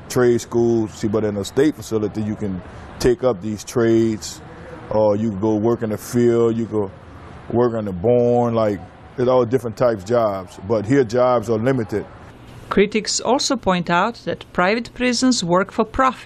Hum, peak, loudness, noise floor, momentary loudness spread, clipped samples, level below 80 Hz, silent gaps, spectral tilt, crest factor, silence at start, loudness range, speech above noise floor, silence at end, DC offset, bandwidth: none; -4 dBFS; -19 LUFS; -39 dBFS; 11 LU; under 0.1%; -46 dBFS; none; -5.5 dB/octave; 16 dB; 0 s; 2 LU; 21 dB; 0 s; under 0.1%; 13 kHz